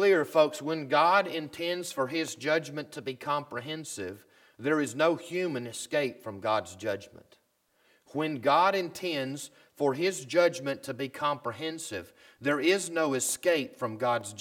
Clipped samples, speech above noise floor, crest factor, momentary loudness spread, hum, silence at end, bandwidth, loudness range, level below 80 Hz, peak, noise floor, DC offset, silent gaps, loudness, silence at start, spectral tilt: under 0.1%; 41 dB; 20 dB; 13 LU; none; 0 s; 18 kHz; 4 LU; -78 dBFS; -10 dBFS; -70 dBFS; under 0.1%; none; -29 LUFS; 0 s; -3.5 dB/octave